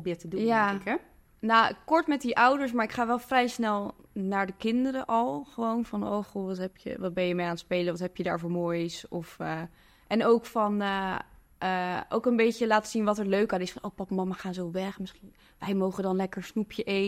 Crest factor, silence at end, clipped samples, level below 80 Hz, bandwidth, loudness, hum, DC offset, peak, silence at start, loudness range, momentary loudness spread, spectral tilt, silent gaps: 20 dB; 0 s; under 0.1%; -62 dBFS; 15.5 kHz; -29 LUFS; none; under 0.1%; -8 dBFS; 0 s; 5 LU; 11 LU; -5.5 dB/octave; none